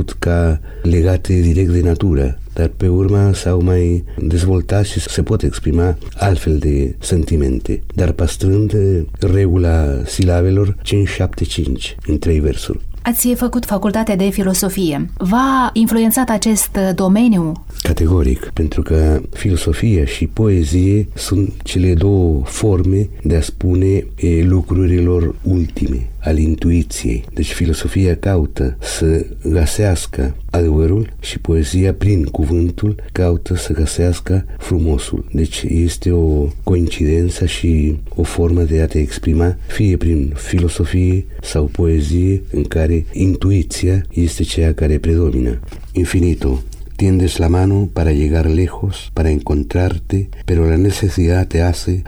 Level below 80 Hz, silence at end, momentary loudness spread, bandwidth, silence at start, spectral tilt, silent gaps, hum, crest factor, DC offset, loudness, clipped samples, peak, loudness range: -22 dBFS; 0 s; 6 LU; 19.5 kHz; 0 s; -6.5 dB/octave; none; none; 14 dB; under 0.1%; -16 LUFS; under 0.1%; 0 dBFS; 2 LU